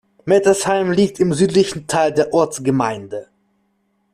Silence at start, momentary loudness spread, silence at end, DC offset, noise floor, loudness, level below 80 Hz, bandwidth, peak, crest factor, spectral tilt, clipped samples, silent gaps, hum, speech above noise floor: 0.25 s; 7 LU; 0.9 s; under 0.1%; -65 dBFS; -17 LUFS; -54 dBFS; 14 kHz; -2 dBFS; 14 dB; -5 dB/octave; under 0.1%; none; none; 49 dB